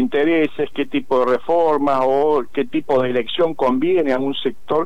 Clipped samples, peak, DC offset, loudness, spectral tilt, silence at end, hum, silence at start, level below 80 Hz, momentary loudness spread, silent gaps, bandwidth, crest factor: under 0.1%; -8 dBFS; 4%; -18 LUFS; -6.5 dB/octave; 0 s; none; 0 s; -54 dBFS; 6 LU; none; 9 kHz; 10 dB